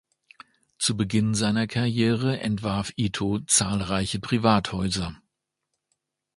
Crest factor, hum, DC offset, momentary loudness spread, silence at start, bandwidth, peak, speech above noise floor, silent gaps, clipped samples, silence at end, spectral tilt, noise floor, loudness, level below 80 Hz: 22 dB; none; under 0.1%; 7 LU; 0.8 s; 11.5 kHz; -4 dBFS; 57 dB; none; under 0.1%; 1.2 s; -4.5 dB/octave; -81 dBFS; -24 LUFS; -48 dBFS